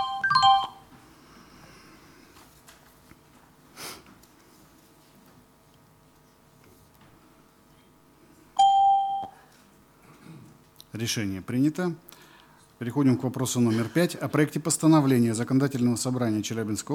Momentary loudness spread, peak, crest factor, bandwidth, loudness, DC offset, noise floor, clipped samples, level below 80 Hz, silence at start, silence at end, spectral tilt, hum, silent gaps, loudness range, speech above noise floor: 18 LU; -8 dBFS; 20 dB; 19 kHz; -24 LUFS; under 0.1%; -58 dBFS; under 0.1%; -66 dBFS; 0 s; 0 s; -5 dB/octave; none; none; 24 LU; 33 dB